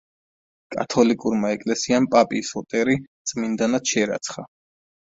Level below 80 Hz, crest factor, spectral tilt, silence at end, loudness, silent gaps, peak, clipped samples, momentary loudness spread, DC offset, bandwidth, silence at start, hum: -60 dBFS; 20 dB; -4 dB/octave; 0.7 s; -22 LUFS; 3.08-3.25 s; -2 dBFS; under 0.1%; 11 LU; under 0.1%; 7.8 kHz; 0.7 s; none